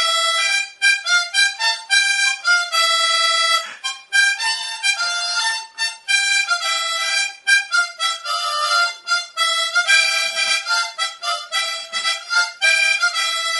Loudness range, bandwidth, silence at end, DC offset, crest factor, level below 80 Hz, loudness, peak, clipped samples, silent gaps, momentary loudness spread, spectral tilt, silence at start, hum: 2 LU; 12 kHz; 0 s; under 0.1%; 16 dB; -88 dBFS; -17 LUFS; -2 dBFS; under 0.1%; none; 7 LU; 5.5 dB/octave; 0 s; none